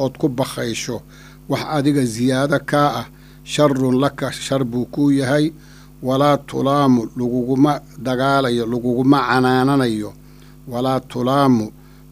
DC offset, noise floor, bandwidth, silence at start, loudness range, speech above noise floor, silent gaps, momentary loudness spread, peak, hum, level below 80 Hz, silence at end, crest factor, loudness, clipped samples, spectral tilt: under 0.1%; -42 dBFS; 15.5 kHz; 0 s; 2 LU; 24 dB; none; 10 LU; 0 dBFS; none; -48 dBFS; 0.4 s; 18 dB; -18 LUFS; under 0.1%; -6 dB/octave